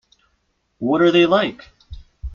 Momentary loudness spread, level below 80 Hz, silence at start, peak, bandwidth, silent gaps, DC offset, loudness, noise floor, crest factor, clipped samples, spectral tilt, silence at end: 14 LU; -40 dBFS; 0.8 s; -4 dBFS; 7 kHz; none; under 0.1%; -17 LUFS; -68 dBFS; 16 dB; under 0.1%; -6.5 dB/octave; 0 s